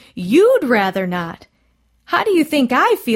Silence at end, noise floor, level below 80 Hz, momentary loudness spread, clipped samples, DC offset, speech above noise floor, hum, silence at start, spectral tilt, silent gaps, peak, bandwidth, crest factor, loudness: 0 s; -60 dBFS; -58 dBFS; 10 LU; under 0.1%; under 0.1%; 45 dB; none; 0.15 s; -5.5 dB/octave; none; -2 dBFS; 16.5 kHz; 14 dB; -16 LUFS